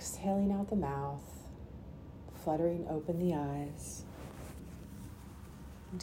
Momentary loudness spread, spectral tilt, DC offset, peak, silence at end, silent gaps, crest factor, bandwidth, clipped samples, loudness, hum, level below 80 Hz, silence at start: 17 LU; -6.5 dB/octave; under 0.1%; -20 dBFS; 0 s; none; 18 dB; 16 kHz; under 0.1%; -37 LUFS; none; -54 dBFS; 0 s